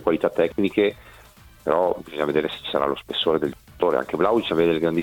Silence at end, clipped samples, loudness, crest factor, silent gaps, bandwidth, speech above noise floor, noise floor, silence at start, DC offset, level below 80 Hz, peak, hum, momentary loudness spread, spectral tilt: 0 s; under 0.1%; -23 LUFS; 18 dB; none; 18 kHz; 27 dB; -49 dBFS; 0 s; under 0.1%; -52 dBFS; -6 dBFS; none; 5 LU; -6.5 dB/octave